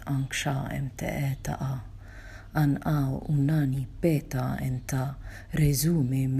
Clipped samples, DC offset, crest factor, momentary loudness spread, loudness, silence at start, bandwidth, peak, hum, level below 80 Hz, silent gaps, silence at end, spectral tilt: under 0.1%; under 0.1%; 16 dB; 11 LU; -28 LUFS; 0 s; 15.5 kHz; -12 dBFS; none; -44 dBFS; none; 0 s; -6 dB/octave